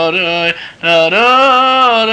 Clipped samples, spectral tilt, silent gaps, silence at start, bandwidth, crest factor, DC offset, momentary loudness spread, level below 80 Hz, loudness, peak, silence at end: under 0.1%; -3.5 dB/octave; none; 0 s; 9.8 kHz; 10 dB; under 0.1%; 7 LU; -54 dBFS; -9 LUFS; -2 dBFS; 0 s